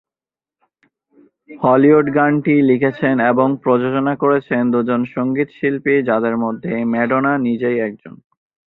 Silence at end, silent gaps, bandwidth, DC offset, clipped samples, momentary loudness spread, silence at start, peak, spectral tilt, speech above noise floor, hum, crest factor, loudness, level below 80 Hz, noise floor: 0.6 s; none; 4.1 kHz; under 0.1%; under 0.1%; 7 LU; 1.5 s; 0 dBFS; -10.5 dB/octave; over 74 dB; none; 16 dB; -16 LUFS; -60 dBFS; under -90 dBFS